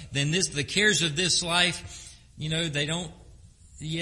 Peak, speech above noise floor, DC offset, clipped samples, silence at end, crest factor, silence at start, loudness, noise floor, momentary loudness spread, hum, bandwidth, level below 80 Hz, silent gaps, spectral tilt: -8 dBFS; 25 dB; under 0.1%; under 0.1%; 0 s; 20 dB; 0 s; -25 LUFS; -51 dBFS; 19 LU; none; 11.5 kHz; -52 dBFS; none; -2.5 dB/octave